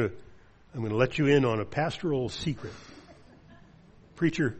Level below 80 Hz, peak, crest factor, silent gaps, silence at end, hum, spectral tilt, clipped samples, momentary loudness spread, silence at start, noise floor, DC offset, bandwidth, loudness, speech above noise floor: -56 dBFS; -10 dBFS; 20 dB; none; 0 s; none; -6.5 dB/octave; under 0.1%; 20 LU; 0 s; -55 dBFS; under 0.1%; 8.4 kHz; -28 LUFS; 27 dB